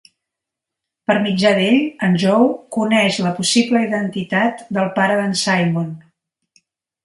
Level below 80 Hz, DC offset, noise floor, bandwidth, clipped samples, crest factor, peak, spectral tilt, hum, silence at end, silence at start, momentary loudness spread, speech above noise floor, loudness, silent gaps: -62 dBFS; under 0.1%; -83 dBFS; 11.5 kHz; under 0.1%; 18 dB; 0 dBFS; -5 dB/octave; none; 1.05 s; 1.1 s; 7 LU; 67 dB; -17 LUFS; none